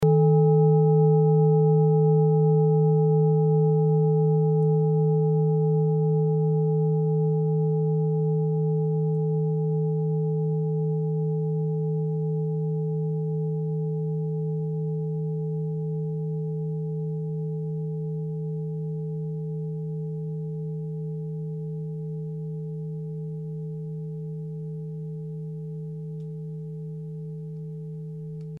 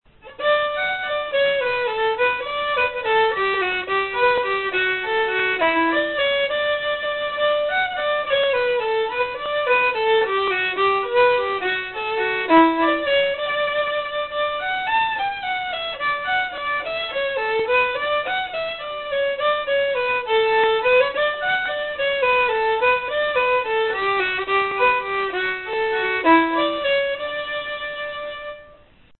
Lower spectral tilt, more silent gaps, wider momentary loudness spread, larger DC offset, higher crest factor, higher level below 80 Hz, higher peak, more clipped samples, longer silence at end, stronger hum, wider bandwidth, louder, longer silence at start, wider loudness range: first, -13.5 dB/octave vs -7.5 dB/octave; neither; first, 15 LU vs 7 LU; second, under 0.1% vs 0.1%; about the same, 14 dB vs 16 dB; second, -62 dBFS vs -54 dBFS; second, -12 dBFS vs -4 dBFS; neither; second, 0 s vs 0.5 s; neither; second, 1.4 kHz vs 4.3 kHz; second, -25 LUFS vs -20 LUFS; second, 0 s vs 0.25 s; first, 14 LU vs 3 LU